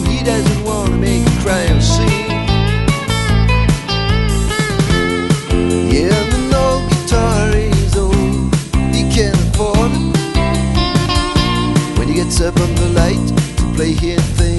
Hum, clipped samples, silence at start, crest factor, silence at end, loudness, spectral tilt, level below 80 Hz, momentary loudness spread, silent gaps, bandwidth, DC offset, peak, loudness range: none; under 0.1%; 0 s; 12 dB; 0 s; -14 LUFS; -5.5 dB/octave; -20 dBFS; 3 LU; none; 12 kHz; under 0.1%; 0 dBFS; 1 LU